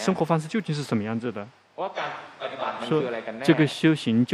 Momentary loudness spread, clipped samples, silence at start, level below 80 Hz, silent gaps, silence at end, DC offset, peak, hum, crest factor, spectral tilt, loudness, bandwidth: 13 LU; under 0.1%; 0 s; -72 dBFS; none; 0 s; under 0.1%; -4 dBFS; none; 20 dB; -6.5 dB/octave; -26 LUFS; 12.5 kHz